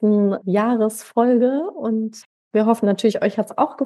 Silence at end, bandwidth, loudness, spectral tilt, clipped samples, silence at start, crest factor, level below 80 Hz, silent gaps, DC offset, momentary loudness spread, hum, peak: 0 s; 12.5 kHz; -19 LUFS; -6.5 dB/octave; under 0.1%; 0 s; 14 dB; -78 dBFS; 2.26-2.51 s; under 0.1%; 7 LU; none; -4 dBFS